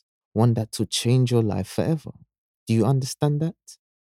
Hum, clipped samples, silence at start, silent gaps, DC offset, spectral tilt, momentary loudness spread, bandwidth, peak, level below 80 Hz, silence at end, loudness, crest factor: none; under 0.1%; 0.35 s; 2.38-2.66 s; under 0.1%; -6.5 dB/octave; 10 LU; 15 kHz; -6 dBFS; -58 dBFS; 0.4 s; -23 LUFS; 18 dB